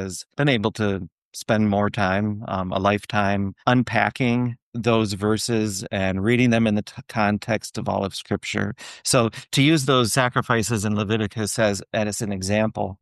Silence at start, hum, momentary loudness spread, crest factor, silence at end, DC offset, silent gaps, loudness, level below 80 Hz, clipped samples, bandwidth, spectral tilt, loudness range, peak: 0 s; none; 8 LU; 18 dB; 0.05 s; under 0.1%; 1.12-1.31 s, 4.62-4.72 s; -22 LUFS; -56 dBFS; under 0.1%; 12.5 kHz; -5 dB/octave; 2 LU; -4 dBFS